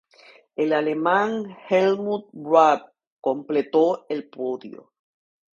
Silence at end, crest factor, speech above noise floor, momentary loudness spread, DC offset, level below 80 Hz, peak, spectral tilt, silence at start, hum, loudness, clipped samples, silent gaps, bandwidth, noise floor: 0.8 s; 22 dB; 31 dB; 13 LU; under 0.1%; -74 dBFS; -2 dBFS; -6 dB/octave; 0.6 s; none; -22 LUFS; under 0.1%; 3.07-3.17 s; 7.4 kHz; -53 dBFS